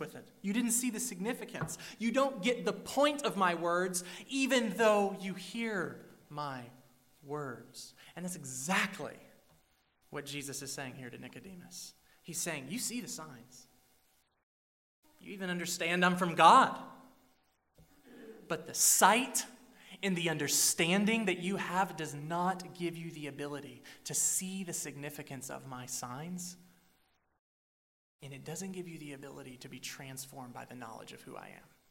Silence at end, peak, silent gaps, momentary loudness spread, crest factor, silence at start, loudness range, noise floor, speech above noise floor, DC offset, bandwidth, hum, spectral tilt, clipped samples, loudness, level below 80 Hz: 0.35 s; -10 dBFS; 14.43-15.03 s, 27.39-28.19 s; 21 LU; 26 dB; 0 s; 16 LU; -73 dBFS; 39 dB; under 0.1%; 16 kHz; none; -3 dB/octave; under 0.1%; -33 LUFS; -76 dBFS